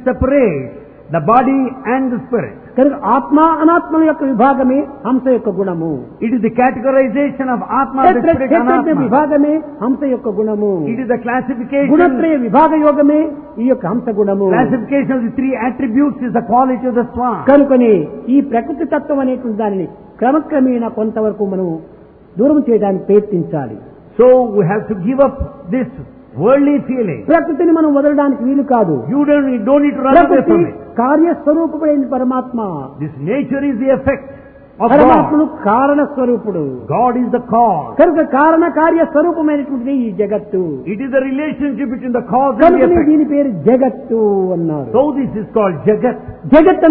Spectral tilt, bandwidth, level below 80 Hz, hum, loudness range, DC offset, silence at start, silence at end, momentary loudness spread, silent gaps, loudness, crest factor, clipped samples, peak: -11.5 dB/octave; 4 kHz; -42 dBFS; none; 3 LU; under 0.1%; 0 s; 0 s; 9 LU; none; -13 LUFS; 12 dB; under 0.1%; 0 dBFS